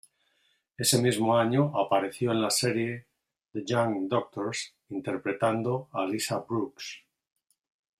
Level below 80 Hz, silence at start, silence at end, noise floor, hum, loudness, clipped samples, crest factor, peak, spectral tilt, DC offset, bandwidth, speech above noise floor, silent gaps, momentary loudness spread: -70 dBFS; 0.8 s; 1 s; -72 dBFS; none; -28 LUFS; under 0.1%; 20 dB; -10 dBFS; -4.5 dB/octave; under 0.1%; 15.5 kHz; 44 dB; none; 13 LU